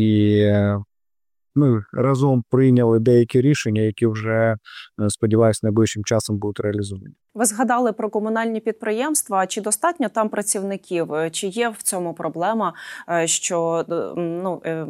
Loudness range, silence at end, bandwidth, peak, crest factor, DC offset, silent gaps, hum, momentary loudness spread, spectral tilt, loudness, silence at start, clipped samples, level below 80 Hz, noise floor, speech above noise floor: 4 LU; 0 s; 15.5 kHz; -6 dBFS; 14 dB; under 0.1%; none; none; 9 LU; -5.5 dB/octave; -20 LUFS; 0 s; under 0.1%; -60 dBFS; under -90 dBFS; over 70 dB